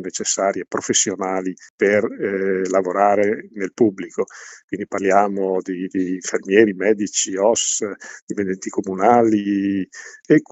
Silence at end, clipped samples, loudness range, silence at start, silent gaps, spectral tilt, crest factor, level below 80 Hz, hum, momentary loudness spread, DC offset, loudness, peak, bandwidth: 0.1 s; under 0.1%; 2 LU; 0 s; 1.70-1.78 s, 4.64-4.68 s, 8.22-8.27 s; -3.5 dB/octave; 20 dB; -70 dBFS; none; 13 LU; under 0.1%; -19 LUFS; 0 dBFS; 8.4 kHz